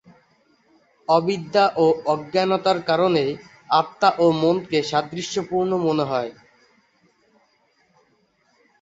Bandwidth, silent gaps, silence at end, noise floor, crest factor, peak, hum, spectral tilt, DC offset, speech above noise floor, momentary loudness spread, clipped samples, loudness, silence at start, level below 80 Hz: 8 kHz; none; 2.5 s; -64 dBFS; 20 dB; -2 dBFS; none; -5.5 dB/octave; under 0.1%; 44 dB; 9 LU; under 0.1%; -21 LUFS; 1.1 s; -64 dBFS